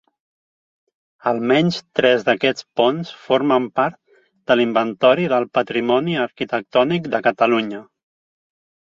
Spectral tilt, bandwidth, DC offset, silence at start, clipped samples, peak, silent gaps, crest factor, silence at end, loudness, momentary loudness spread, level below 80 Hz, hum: -6 dB/octave; 7.4 kHz; under 0.1%; 1.25 s; under 0.1%; -2 dBFS; none; 18 dB; 1.1 s; -19 LUFS; 7 LU; -62 dBFS; none